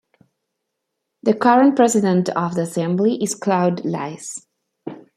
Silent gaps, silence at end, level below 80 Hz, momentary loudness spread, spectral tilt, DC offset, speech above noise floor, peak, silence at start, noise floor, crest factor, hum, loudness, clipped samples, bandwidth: none; 0.2 s; -66 dBFS; 19 LU; -6 dB/octave; under 0.1%; 60 dB; -2 dBFS; 1.25 s; -78 dBFS; 18 dB; none; -18 LUFS; under 0.1%; 14 kHz